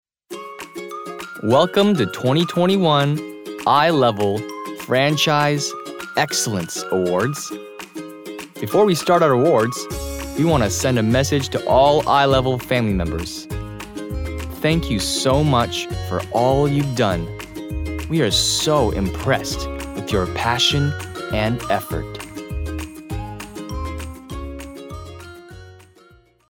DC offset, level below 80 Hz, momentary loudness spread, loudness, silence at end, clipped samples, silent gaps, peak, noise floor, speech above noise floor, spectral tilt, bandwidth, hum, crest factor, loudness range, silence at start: under 0.1%; -36 dBFS; 17 LU; -19 LUFS; 0.75 s; under 0.1%; none; -4 dBFS; -52 dBFS; 34 dB; -4.5 dB/octave; 19.5 kHz; none; 16 dB; 9 LU; 0.3 s